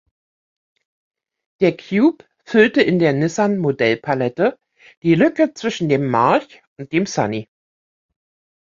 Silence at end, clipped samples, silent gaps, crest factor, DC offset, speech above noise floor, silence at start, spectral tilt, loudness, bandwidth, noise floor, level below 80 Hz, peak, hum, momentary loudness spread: 1.2 s; under 0.1%; 4.97-5.02 s, 6.67-6.76 s; 18 dB; under 0.1%; over 73 dB; 1.6 s; -6 dB/octave; -18 LUFS; 7.6 kHz; under -90 dBFS; -60 dBFS; -2 dBFS; none; 8 LU